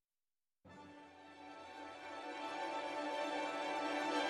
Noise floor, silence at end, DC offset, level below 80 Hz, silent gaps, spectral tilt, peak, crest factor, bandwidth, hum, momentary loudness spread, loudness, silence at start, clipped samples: under -90 dBFS; 0 s; under 0.1%; -86 dBFS; none; -2.5 dB/octave; -26 dBFS; 18 dB; 13 kHz; none; 18 LU; -42 LUFS; 0.65 s; under 0.1%